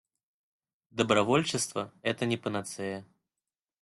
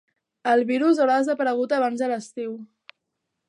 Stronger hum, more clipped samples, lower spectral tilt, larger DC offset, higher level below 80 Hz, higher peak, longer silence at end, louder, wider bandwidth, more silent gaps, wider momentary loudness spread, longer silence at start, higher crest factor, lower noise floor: neither; neither; about the same, -4 dB/octave vs -4.5 dB/octave; neither; first, -68 dBFS vs -82 dBFS; about the same, -10 dBFS vs -8 dBFS; about the same, 0.75 s vs 0.85 s; second, -30 LUFS vs -22 LUFS; first, 12.5 kHz vs 11 kHz; neither; about the same, 13 LU vs 13 LU; first, 0.95 s vs 0.45 s; first, 22 dB vs 16 dB; first, under -90 dBFS vs -80 dBFS